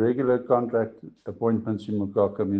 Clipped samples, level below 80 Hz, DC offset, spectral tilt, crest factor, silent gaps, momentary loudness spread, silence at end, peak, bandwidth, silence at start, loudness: under 0.1%; -66 dBFS; under 0.1%; -10 dB/octave; 18 dB; none; 10 LU; 0 s; -8 dBFS; 7.4 kHz; 0 s; -25 LUFS